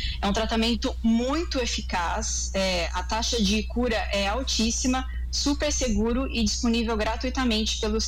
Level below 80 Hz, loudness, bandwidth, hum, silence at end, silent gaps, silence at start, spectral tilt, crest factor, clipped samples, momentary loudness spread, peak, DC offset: -32 dBFS; -25 LUFS; 15.5 kHz; none; 0 s; none; 0 s; -3.5 dB/octave; 12 dB; under 0.1%; 3 LU; -14 dBFS; under 0.1%